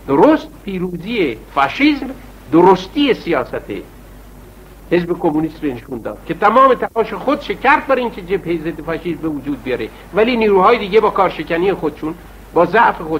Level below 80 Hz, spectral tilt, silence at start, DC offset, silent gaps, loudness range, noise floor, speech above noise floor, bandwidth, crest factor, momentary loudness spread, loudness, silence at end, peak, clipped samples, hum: -40 dBFS; -6.5 dB/octave; 0 s; under 0.1%; none; 3 LU; -38 dBFS; 23 dB; 16 kHz; 16 dB; 14 LU; -16 LUFS; 0 s; 0 dBFS; under 0.1%; none